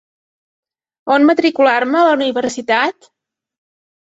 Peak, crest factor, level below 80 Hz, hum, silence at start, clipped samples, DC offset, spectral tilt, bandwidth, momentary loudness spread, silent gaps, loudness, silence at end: -2 dBFS; 16 dB; -64 dBFS; none; 1.05 s; under 0.1%; under 0.1%; -3.5 dB/octave; 8 kHz; 8 LU; none; -14 LUFS; 1.15 s